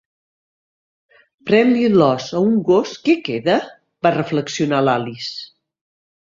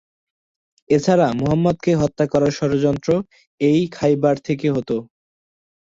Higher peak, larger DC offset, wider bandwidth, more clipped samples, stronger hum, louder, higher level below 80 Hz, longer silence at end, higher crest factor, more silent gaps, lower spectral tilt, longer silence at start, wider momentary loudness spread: about the same, -2 dBFS vs -2 dBFS; neither; about the same, 7.6 kHz vs 7.8 kHz; neither; neither; about the same, -17 LUFS vs -19 LUFS; second, -60 dBFS vs -50 dBFS; second, 0.75 s vs 0.9 s; about the same, 18 dB vs 16 dB; second, none vs 3.47-3.58 s; about the same, -6 dB/octave vs -7 dB/octave; first, 1.45 s vs 0.9 s; first, 13 LU vs 5 LU